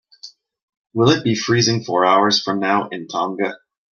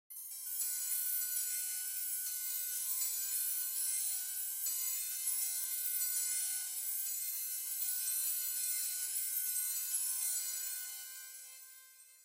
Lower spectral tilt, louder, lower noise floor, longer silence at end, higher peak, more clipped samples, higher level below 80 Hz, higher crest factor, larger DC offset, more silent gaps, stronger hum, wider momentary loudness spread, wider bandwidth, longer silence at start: first, -4.5 dB/octave vs 10 dB/octave; first, -18 LUFS vs -35 LUFS; second, -44 dBFS vs -59 dBFS; first, 0.35 s vs 0 s; first, -2 dBFS vs -22 dBFS; neither; first, -58 dBFS vs under -90 dBFS; about the same, 16 dB vs 16 dB; neither; first, 0.63-0.68 s, 0.77-0.84 s vs none; neither; about the same, 10 LU vs 8 LU; second, 7.2 kHz vs 16 kHz; first, 0.25 s vs 0.1 s